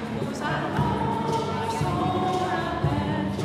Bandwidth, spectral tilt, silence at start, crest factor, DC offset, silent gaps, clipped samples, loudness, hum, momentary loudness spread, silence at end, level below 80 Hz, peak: 14.5 kHz; -6.5 dB/octave; 0 s; 14 dB; under 0.1%; none; under 0.1%; -26 LUFS; none; 3 LU; 0 s; -46 dBFS; -12 dBFS